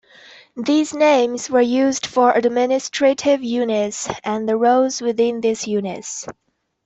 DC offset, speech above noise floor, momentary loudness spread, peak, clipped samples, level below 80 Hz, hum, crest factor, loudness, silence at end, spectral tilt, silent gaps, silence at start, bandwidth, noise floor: under 0.1%; 28 dB; 11 LU; -4 dBFS; under 0.1%; -62 dBFS; none; 16 dB; -18 LUFS; 0.55 s; -3.5 dB/octave; none; 0.55 s; 8.4 kHz; -46 dBFS